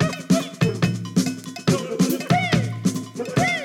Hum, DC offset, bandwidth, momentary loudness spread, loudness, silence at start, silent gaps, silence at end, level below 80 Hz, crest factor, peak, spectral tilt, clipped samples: none; under 0.1%; 17.5 kHz; 6 LU; -22 LUFS; 0 s; none; 0 s; -50 dBFS; 16 dB; -6 dBFS; -5.5 dB/octave; under 0.1%